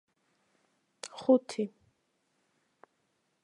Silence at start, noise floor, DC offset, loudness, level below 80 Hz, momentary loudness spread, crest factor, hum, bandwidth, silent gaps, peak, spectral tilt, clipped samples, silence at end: 1.05 s; -77 dBFS; under 0.1%; -30 LUFS; -86 dBFS; 19 LU; 24 dB; none; 11 kHz; none; -12 dBFS; -5.5 dB/octave; under 0.1%; 1.75 s